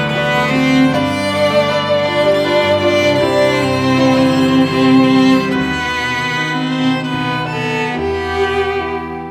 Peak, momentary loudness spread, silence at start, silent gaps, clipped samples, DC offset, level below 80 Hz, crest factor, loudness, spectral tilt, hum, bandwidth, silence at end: 0 dBFS; 7 LU; 0 s; none; under 0.1%; under 0.1%; -42 dBFS; 14 dB; -14 LUFS; -5.5 dB/octave; none; 14.5 kHz; 0 s